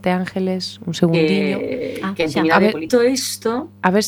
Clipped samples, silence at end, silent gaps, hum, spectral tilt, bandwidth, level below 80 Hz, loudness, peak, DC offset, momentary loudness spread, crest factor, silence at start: under 0.1%; 0 s; none; none; -5 dB/octave; 19 kHz; -54 dBFS; -18 LUFS; 0 dBFS; under 0.1%; 9 LU; 18 dB; 0 s